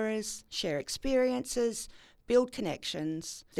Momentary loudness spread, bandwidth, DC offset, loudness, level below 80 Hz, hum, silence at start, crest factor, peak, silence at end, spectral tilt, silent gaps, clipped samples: 8 LU; 15 kHz; under 0.1%; -32 LUFS; -54 dBFS; none; 0 s; 18 dB; -14 dBFS; 0 s; -3.5 dB/octave; none; under 0.1%